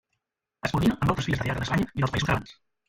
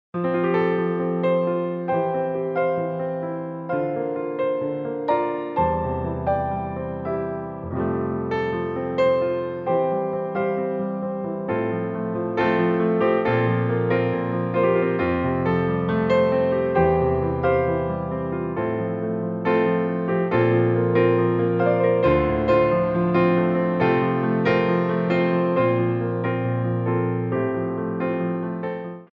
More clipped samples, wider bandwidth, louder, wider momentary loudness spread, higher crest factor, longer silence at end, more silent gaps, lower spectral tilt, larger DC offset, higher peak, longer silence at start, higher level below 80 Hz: neither; first, 16.5 kHz vs 5.4 kHz; second, -27 LUFS vs -22 LUFS; about the same, 6 LU vs 8 LU; about the same, 18 dB vs 16 dB; first, 0.35 s vs 0.05 s; neither; second, -6 dB/octave vs -10 dB/octave; neither; about the same, -8 dBFS vs -6 dBFS; first, 0.65 s vs 0.15 s; about the same, -44 dBFS vs -46 dBFS